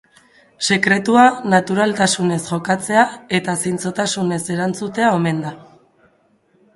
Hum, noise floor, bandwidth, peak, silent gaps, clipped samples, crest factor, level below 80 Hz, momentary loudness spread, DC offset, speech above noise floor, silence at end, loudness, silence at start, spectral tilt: none; -58 dBFS; 11.5 kHz; 0 dBFS; none; under 0.1%; 18 dB; -60 dBFS; 9 LU; under 0.1%; 41 dB; 1.15 s; -17 LUFS; 0.6 s; -4.5 dB/octave